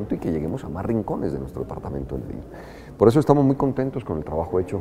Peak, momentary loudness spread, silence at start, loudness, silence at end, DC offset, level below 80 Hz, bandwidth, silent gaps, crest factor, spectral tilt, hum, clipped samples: 0 dBFS; 17 LU; 0 s; -23 LUFS; 0 s; under 0.1%; -42 dBFS; 14.5 kHz; none; 22 dB; -9 dB/octave; none; under 0.1%